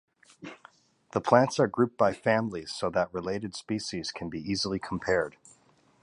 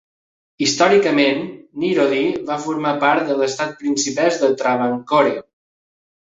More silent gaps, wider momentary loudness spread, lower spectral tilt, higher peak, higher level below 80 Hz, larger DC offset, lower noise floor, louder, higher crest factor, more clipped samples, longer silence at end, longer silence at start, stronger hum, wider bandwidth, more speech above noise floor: neither; first, 13 LU vs 9 LU; first, -5 dB/octave vs -3.5 dB/octave; second, -6 dBFS vs -2 dBFS; first, -58 dBFS vs -64 dBFS; neither; second, -63 dBFS vs under -90 dBFS; second, -29 LUFS vs -18 LUFS; first, 24 dB vs 16 dB; neither; about the same, 0.75 s vs 0.8 s; second, 0.4 s vs 0.6 s; neither; first, 11.5 kHz vs 8 kHz; second, 35 dB vs over 73 dB